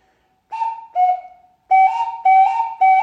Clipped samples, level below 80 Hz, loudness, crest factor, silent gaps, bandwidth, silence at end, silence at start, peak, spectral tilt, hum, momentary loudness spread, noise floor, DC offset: under 0.1%; -72 dBFS; -17 LUFS; 12 dB; none; 6.2 kHz; 0 s; 0.5 s; -4 dBFS; -0.5 dB/octave; none; 12 LU; -62 dBFS; under 0.1%